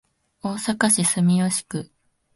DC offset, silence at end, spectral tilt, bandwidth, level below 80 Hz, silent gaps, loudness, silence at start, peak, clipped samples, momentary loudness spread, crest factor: under 0.1%; 0.5 s; -4 dB/octave; 12 kHz; -62 dBFS; none; -20 LUFS; 0.45 s; -4 dBFS; under 0.1%; 15 LU; 20 dB